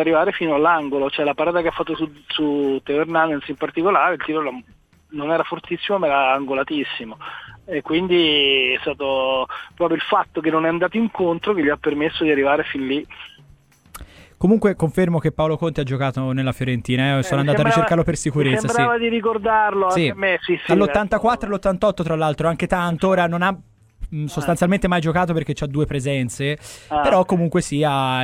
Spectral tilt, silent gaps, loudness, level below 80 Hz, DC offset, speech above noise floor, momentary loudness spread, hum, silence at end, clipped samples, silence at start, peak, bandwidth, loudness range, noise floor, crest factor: -5.5 dB/octave; none; -19 LUFS; -44 dBFS; under 0.1%; 32 dB; 8 LU; none; 0 s; under 0.1%; 0 s; -2 dBFS; 15.5 kHz; 3 LU; -51 dBFS; 16 dB